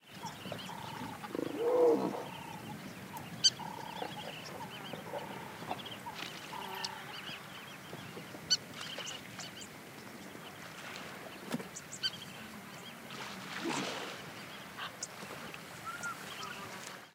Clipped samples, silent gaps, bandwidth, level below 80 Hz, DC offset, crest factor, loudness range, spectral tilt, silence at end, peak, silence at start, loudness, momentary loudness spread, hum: under 0.1%; none; 16 kHz; -78 dBFS; under 0.1%; 28 dB; 9 LU; -2.5 dB/octave; 0 s; -12 dBFS; 0.05 s; -39 LUFS; 14 LU; none